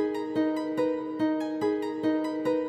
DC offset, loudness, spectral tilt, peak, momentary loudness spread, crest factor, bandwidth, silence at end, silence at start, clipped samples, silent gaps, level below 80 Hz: under 0.1%; -29 LUFS; -6.5 dB/octave; -16 dBFS; 1 LU; 12 dB; 9 kHz; 0 s; 0 s; under 0.1%; none; -68 dBFS